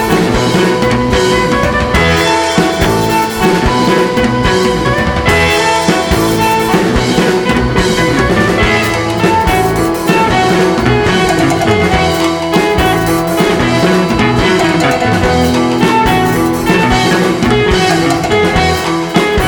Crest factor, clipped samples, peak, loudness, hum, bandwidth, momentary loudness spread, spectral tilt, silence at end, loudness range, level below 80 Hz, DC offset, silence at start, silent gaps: 10 dB; under 0.1%; 0 dBFS; -10 LUFS; none; over 20 kHz; 2 LU; -5 dB/octave; 0 s; 0 LU; -24 dBFS; under 0.1%; 0 s; none